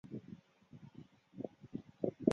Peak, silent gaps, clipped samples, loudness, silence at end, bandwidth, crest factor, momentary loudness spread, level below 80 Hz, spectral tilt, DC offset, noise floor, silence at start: -14 dBFS; none; under 0.1%; -44 LUFS; 0 s; 7 kHz; 28 dB; 18 LU; -76 dBFS; -9.5 dB/octave; under 0.1%; -60 dBFS; 0.05 s